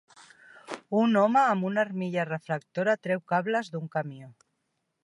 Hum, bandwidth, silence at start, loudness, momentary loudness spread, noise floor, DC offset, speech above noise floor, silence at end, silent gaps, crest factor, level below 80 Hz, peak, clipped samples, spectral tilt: none; 11.5 kHz; 0.7 s; -27 LUFS; 13 LU; -79 dBFS; under 0.1%; 52 dB; 0.7 s; none; 18 dB; -80 dBFS; -10 dBFS; under 0.1%; -7 dB/octave